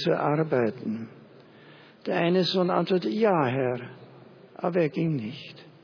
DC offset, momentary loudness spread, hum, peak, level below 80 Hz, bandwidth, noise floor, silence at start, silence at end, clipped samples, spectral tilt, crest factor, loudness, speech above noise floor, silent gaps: under 0.1%; 15 LU; none; -8 dBFS; -74 dBFS; 5.4 kHz; -51 dBFS; 0 s; 0.15 s; under 0.1%; -7.5 dB/octave; 18 dB; -26 LUFS; 26 dB; none